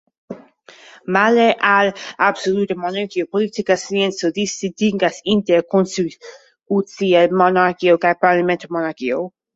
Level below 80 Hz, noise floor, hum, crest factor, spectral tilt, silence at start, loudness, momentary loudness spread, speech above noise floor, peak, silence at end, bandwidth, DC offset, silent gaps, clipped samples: -62 dBFS; -45 dBFS; none; 16 dB; -5 dB/octave; 0.3 s; -17 LUFS; 9 LU; 28 dB; -2 dBFS; 0.3 s; 8 kHz; under 0.1%; none; under 0.1%